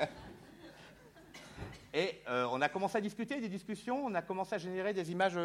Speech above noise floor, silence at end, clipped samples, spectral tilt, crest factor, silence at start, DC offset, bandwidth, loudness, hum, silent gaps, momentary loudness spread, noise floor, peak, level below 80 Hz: 22 dB; 0 s; under 0.1%; -5.5 dB/octave; 22 dB; 0 s; under 0.1%; 16.5 kHz; -37 LUFS; none; none; 21 LU; -58 dBFS; -16 dBFS; -66 dBFS